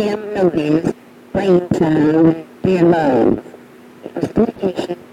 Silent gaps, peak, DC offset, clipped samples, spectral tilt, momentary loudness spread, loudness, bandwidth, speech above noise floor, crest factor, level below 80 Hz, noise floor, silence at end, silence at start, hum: none; -2 dBFS; under 0.1%; under 0.1%; -8 dB/octave; 12 LU; -16 LUFS; 10 kHz; 25 dB; 14 dB; -46 dBFS; -40 dBFS; 0.1 s; 0 s; none